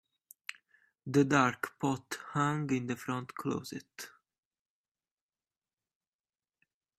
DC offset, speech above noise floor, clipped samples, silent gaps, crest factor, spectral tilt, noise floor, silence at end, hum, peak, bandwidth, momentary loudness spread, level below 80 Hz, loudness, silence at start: under 0.1%; over 57 dB; under 0.1%; none; 26 dB; -5.5 dB/octave; under -90 dBFS; 2.9 s; none; -10 dBFS; 14.5 kHz; 19 LU; -74 dBFS; -32 LUFS; 0.5 s